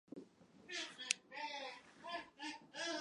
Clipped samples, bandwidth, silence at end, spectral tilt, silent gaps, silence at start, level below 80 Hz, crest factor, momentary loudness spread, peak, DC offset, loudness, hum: under 0.1%; 11 kHz; 0 s; -0.5 dB/octave; none; 0.1 s; -88 dBFS; 36 dB; 16 LU; -12 dBFS; under 0.1%; -46 LUFS; none